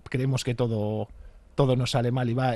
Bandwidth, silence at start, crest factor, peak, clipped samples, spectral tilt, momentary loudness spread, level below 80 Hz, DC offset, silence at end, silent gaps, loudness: 12.5 kHz; 0.1 s; 18 dB; -8 dBFS; under 0.1%; -6.5 dB/octave; 10 LU; -50 dBFS; under 0.1%; 0 s; none; -27 LUFS